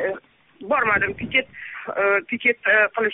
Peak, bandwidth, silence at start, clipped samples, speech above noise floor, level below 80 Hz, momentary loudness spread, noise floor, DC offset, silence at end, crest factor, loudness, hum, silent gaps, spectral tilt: -6 dBFS; 3.9 kHz; 0 s; under 0.1%; 22 dB; -56 dBFS; 16 LU; -43 dBFS; under 0.1%; 0 s; 16 dB; -20 LUFS; none; none; 2 dB/octave